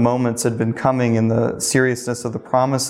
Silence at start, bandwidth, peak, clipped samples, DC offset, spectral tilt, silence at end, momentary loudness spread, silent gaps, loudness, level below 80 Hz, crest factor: 0 s; 15.5 kHz; -4 dBFS; under 0.1%; under 0.1%; -5 dB/octave; 0 s; 5 LU; none; -19 LUFS; -54 dBFS; 16 dB